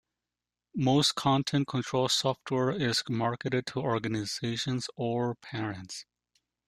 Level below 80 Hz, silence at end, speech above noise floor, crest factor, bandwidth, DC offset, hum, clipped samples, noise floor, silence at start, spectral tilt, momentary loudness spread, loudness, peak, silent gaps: -64 dBFS; 0.65 s; 60 dB; 18 dB; 14.5 kHz; under 0.1%; 60 Hz at -55 dBFS; under 0.1%; -90 dBFS; 0.75 s; -4.5 dB/octave; 11 LU; -29 LUFS; -12 dBFS; none